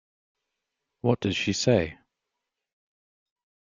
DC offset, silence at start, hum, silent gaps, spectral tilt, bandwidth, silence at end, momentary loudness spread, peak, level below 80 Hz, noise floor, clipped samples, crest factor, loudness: under 0.1%; 1.05 s; none; none; -5 dB/octave; 9.4 kHz; 1.7 s; 7 LU; -8 dBFS; -60 dBFS; -85 dBFS; under 0.1%; 24 dB; -26 LUFS